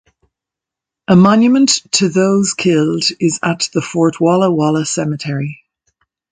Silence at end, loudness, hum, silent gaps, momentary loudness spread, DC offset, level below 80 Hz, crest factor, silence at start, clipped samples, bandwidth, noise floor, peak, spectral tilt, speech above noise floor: 0.75 s; -13 LUFS; none; none; 10 LU; under 0.1%; -54 dBFS; 14 dB; 1.1 s; under 0.1%; 9.6 kHz; -85 dBFS; 0 dBFS; -4.5 dB/octave; 72 dB